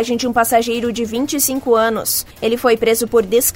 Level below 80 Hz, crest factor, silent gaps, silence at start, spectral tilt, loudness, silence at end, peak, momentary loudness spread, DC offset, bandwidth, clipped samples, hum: -46 dBFS; 14 dB; none; 0 s; -2.5 dB/octave; -16 LUFS; 0 s; -2 dBFS; 5 LU; under 0.1%; 16.5 kHz; under 0.1%; none